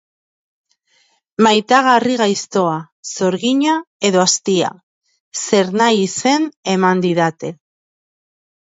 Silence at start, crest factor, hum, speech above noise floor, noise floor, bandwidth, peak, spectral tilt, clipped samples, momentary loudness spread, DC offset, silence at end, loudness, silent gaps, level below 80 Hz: 1.4 s; 18 dB; none; 44 dB; -59 dBFS; 8 kHz; 0 dBFS; -4 dB/octave; under 0.1%; 12 LU; under 0.1%; 1.1 s; -15 LUFS; 2.92-3.03 s, 3.87-4.00 s, 4.83-5.01 s, 5.20-5.31 s, 6.56-6.63 s; -66 dBFS